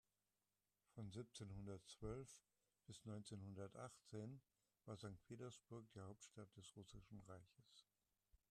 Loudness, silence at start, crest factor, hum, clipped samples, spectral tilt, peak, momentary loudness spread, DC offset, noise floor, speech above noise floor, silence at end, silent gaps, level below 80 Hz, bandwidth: -59 LUFS; 0.95 s; 20 dB; 50 Hz at -80 dBFS; under 0.1%; -5.5 dB/octave; -40 dBFS; 8 LU; under 0.1%; under -90 dBFS; over 32 dB; 0.15 s; none; -76 dBFS; 13 kHz